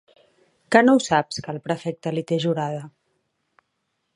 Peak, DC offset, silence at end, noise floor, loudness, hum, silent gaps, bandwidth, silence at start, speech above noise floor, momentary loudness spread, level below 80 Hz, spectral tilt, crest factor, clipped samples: -2 dBFS; under 0.1%; 1.25 s; -75 dBFS; -22 LUFS; none; none; 11.5 kHz; 0.7 s; 54 dB; 14 LU; -64 dBFS; -5.5 dB/octave; 22 dB; under 0.1%